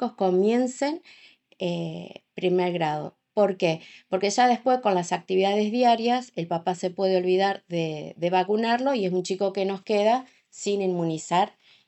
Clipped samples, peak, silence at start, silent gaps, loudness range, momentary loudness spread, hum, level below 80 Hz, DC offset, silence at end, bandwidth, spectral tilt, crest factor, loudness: under 0.1%; -8 dBFS; 0 s; none; 4 LU; 10 LU; none; -76 dBFS; under 0.1%; 0.4 s; 8.4 kHz; -5.5 dB/octave; 16 dB; -25 LUFS